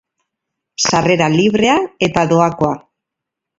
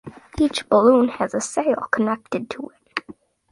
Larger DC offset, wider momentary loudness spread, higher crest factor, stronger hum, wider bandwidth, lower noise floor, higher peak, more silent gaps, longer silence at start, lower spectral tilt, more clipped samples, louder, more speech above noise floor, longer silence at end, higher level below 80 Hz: neither; second, 7 LU vs 16 LU; about the same, 16 dB vs 18 dB; neither; second, 8 kHz vs 11.5 kHz; first, -81 dBFS vs -46 dBFS; about the same, 0 dBFS vs -2 dBFS; neither; first, 0.8 s vs 0.05 s; about the same, -4.5 dB/octave vs -4.5 dB/octave; neither; first, -14 LUFS vs -21 LUFS; first, 68 dB vs 26 dB; first, 0.8 s vs 0.4 s; about the same, -48 dBFS vs -50 dBFS